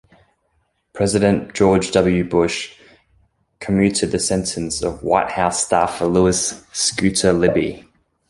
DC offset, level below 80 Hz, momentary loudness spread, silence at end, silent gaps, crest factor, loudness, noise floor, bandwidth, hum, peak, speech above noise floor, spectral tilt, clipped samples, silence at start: under 0.1%; -42 dBFS; 7 LU; 0.5 s; none; 18 dB; -18 LUFS; -66 dBFS; 11.5 kHz; none; -2 dBFS; 49 dB; -4.5 dB/octave; under 0.1%; 0.95 s